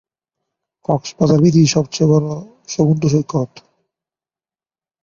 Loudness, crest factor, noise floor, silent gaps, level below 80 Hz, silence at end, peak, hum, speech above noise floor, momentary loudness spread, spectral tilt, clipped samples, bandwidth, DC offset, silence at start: -16 LUFS; 16 dB; under -90 dBFS; none; -52 dBFS; 1.45 s; -2 dBFS; none; over 75 dB; 15 LU; -6.5 dB/octave; under 0.1%; 7.4 kHz; under 0.1%; 0.9 s